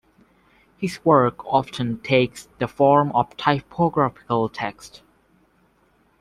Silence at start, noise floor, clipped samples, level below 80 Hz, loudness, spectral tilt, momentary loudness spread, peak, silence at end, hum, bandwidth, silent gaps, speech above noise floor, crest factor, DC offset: 0.8 s; -61 dBFS; under 0.1%; -56 dBFS; -21 LUFS; -6.5 dB/octave; 12 LU; -2 dBFS; 1.3 s; none; 14 kHz; none; 40 dB; 20 dB; under 0.1%